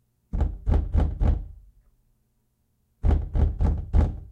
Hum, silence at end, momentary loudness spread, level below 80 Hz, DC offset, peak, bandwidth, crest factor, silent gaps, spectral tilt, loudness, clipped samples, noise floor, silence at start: none; 0 s; 6 LU; -26 dBFS; under 0.1%; -10 dBFS; 4.1 kHz; 14 dB; none; -10 dB/octave; -26 LUFS; under 0.1%; -70 dBFS; 0.35 s